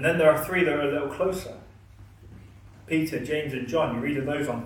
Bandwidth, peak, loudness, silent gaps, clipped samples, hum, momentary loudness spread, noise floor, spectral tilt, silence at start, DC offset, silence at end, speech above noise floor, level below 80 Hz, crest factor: 18 kHz; -8 dBFS; -26 LUFS; none; under 0.1%; none; 8 LU; -49 dBFS; -6 dB/octave; 0 s; under 0.1%; 0 s; 24 dB; -52 dBFS; 20 dB